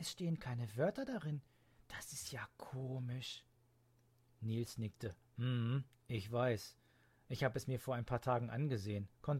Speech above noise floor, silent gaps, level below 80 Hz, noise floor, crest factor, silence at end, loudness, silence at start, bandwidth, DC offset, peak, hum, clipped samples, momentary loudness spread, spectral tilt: 32 dB; none; -68 dBFS; -73 dBFS; 20 dB; 0 s; -42 LUFS; 0 s; 16 kHz; under 0.1%; -22 dBFS; none; under 0.1%; 11 LU; -6 dB/octave